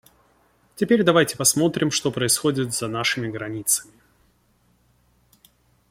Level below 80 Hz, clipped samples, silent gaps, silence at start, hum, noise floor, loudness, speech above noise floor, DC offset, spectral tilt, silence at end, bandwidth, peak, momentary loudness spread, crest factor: -60 dBFS; under 0.1%; none; 0.75 s; none; -63 dBFS; -21 LUFS; 41 dB; under 0.1%; -3.5 dB/octave; 2.1 s; 16.5 kHz; -4 dBFS; 9 LU; 20 dB